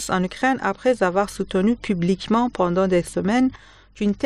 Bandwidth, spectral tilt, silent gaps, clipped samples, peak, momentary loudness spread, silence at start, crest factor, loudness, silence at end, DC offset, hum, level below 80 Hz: 13 kHz; -6 dB/octave; none; under 0.1%; -6 dBFS; 4 LU; 0 s; 14 dB; -21 LUFS; 0 s; 0.1%; none; -48 dBFS